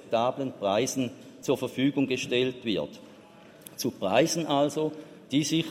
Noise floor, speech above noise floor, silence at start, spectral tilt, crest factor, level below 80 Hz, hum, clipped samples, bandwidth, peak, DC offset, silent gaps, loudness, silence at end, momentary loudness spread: -51 dBFS; 24 dB; 0 s; -4.5 dB/octave; 18 dB; -70 dBFS; none; under 0.1%; 16 kHz; -10 dBFS; under 0.1%; none; -28 LUFS; 0 s; 12 LU